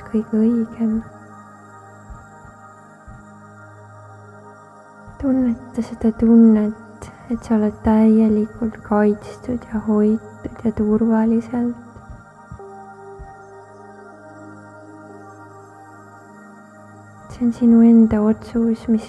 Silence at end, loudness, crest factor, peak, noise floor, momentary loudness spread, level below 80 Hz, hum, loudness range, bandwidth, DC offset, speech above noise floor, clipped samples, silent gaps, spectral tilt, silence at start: 0 s; -18 LUFS; 16 dB; -4 dBFS; -43 dBFS; 27 LU; -44 dBFS; none; 23 LU; 8 kHz; under 0.1%; 27 dB; under 0.1%; none; -9 dB/octave; 0 s